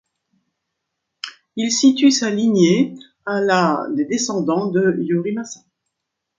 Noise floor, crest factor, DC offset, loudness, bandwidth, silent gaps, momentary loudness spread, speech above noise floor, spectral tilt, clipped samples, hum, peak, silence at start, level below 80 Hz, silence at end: -79 dBFS; 18 dB; under 0.1%; -18 LUFS; 9.2 kHz; none; 18 LU; 62 dB; -4.5 dB/octave; under 0.1%; none; -2 dBFS; 1.25 s; -66 dBFS; 0.85 s